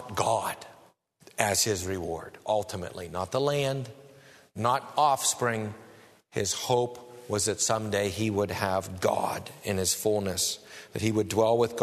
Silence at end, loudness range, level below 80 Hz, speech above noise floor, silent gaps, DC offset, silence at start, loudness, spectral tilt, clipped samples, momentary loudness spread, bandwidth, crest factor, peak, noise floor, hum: 0 s; 2 LU; -60 dBFS; 31 dB; none; under 0.1%; 0 s; -28 LUFS; -3.5 dB/octave; under 0.1%; 12 LU; 13.5 kHz; 24 dB; -6 dBFS; -59 dBFS; none